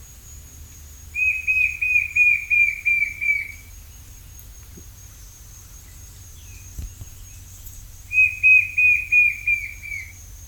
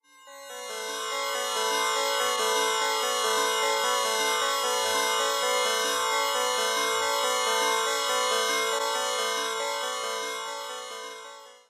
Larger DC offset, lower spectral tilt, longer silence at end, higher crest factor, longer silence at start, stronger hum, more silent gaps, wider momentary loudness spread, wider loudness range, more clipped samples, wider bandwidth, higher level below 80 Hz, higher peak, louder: neither; first, -1.5 dB/octave vs 2 dB/octave; second, 0 s vs 0.15 s; about the same, 16 dB vs 14 dB; second, 0 s vs 0.25 s; neither; neither; first, 26 LU vs 11 LU; first, 23 LU vs 3 LU; neither; first, 19 kHz vs 16 kHz; first, -44 dBFS vs -76 dBFS; first, -6 dBFS vs -12 dBFS; first, -17 LUFS vs -26 LUFS